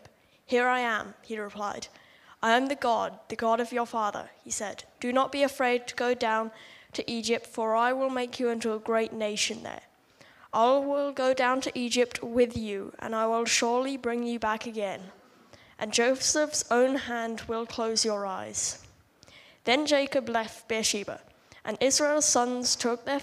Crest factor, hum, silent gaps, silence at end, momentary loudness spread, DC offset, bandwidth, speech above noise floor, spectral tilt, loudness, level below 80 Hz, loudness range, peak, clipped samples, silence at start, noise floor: 20 dB; none; none; 0 s; 12 LU; under 0.1%; 15.5 kHz; 30 dB; -2 dB/octave; -28 LUFS; -64 dBFS; 3 LU; -8 dBFS; under 0.1%; 0.5 s; -58 dBFS